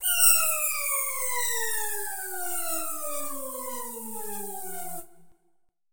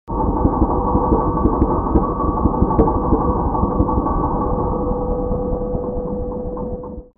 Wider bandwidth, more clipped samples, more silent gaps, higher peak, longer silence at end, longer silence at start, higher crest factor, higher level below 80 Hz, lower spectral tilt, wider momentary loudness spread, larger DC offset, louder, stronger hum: first, over 20 kHz vs 2.3 kHz; neither; neither; second, -6 dBFS vs 0 dBFS; about the same, 0 s vs 0.1 s; about the same, 0 s vs 0.05 s; first, 24 dB vs 18 dB; second, -74 dBFS vs -24 dBFS; second, 0.5 dB/octave vs -9 dB/octave; first, 16 LU vs 8 LU; first, 1% vs under 0.1%; second, -26 LUFS vs -19 LUFS; neither